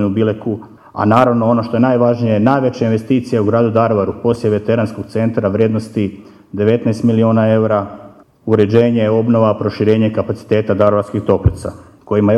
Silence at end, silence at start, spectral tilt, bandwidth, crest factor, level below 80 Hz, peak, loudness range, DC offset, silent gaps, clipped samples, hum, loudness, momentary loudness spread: 0 s; 0 s; -8.5 dB/octave; 10.5 kHz; 14 dB; -38 dBFS; 0 dBFS; 2 LU; under 0.1%; none; under 0.1%; none; -14 LUFS; 8 LU